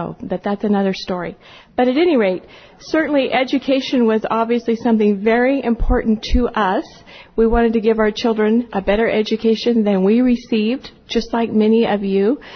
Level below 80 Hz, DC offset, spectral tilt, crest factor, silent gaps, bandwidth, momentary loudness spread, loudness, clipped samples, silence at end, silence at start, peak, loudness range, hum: -32 dBFS; under 0.1%; -6.5 dB/octave; 12 dB; none; 6.6 kHz; 8 LU; -17 LUFS; under 0.1%; 0 s; 0 s; -4 dBFS; 2 LU; none